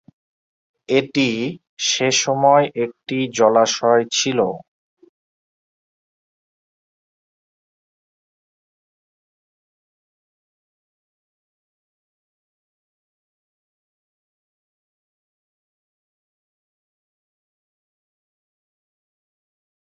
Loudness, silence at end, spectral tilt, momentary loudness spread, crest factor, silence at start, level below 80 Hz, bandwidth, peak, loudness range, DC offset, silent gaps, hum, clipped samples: -18 LUFS; 15.4 s; -3 dB/octave; 10 LU; 24 dB; 0.9 s; -70 dBFS; 8 kHz; 0 dBFS; 8 LU; under 0.1%; 1.69-1.77 s; none; under 0.1%